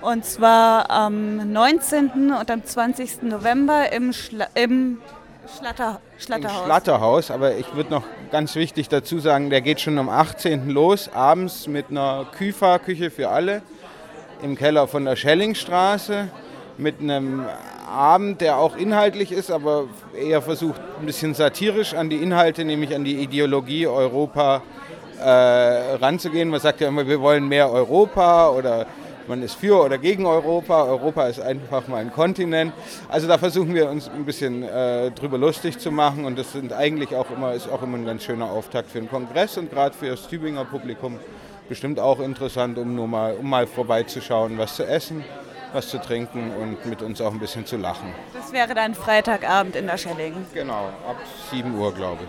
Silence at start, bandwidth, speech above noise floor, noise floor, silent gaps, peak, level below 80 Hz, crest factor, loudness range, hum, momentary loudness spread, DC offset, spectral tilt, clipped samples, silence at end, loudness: 0 s; 19 kHz; 20 dB; -41 dBFS; none; 0 dBFS; -56 dBFS; 20 dB; 8 LU; none; 13 LU; under 0.1%; -5 dB/octave; under 0.1%; 0 s; -21 LUFS